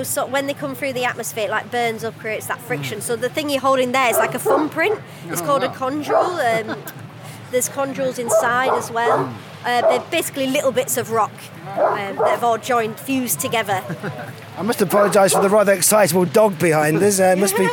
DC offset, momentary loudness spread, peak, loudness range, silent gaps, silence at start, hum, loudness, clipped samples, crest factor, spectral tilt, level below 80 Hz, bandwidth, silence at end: under 0.1%; 12 LU; -2 dBFS; 5 LU; none; 0 s; none; -19 LUFS; under 0.1%; 16 dB; -3.5 dB/octave; -70 dBFS; 19 kHz; 0 s